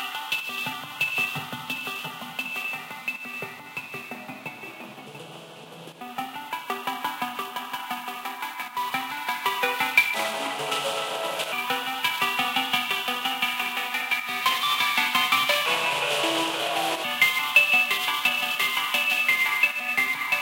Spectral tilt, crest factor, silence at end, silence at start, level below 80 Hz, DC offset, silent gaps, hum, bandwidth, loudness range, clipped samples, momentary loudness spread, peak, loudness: -1 dB/octave; 22 dB; 0 s; 0 s; -82 dBFS; under 0.1%; none; none; 17 kHz; 13 LU; under 0.1%; 15 LU; -4 dBFS; -24 LUFS